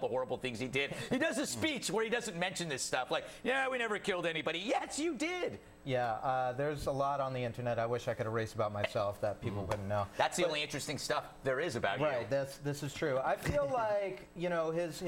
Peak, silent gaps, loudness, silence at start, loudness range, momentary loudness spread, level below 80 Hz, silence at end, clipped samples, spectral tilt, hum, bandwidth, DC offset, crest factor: -18 dBFS; none; -35 LUFS; 0 s; 1 LU; 5 LU; -60 dBFS; 0 s; under 0.1%; -4 dB/octave; none; 17 kHz; under 0.1%; 18 dB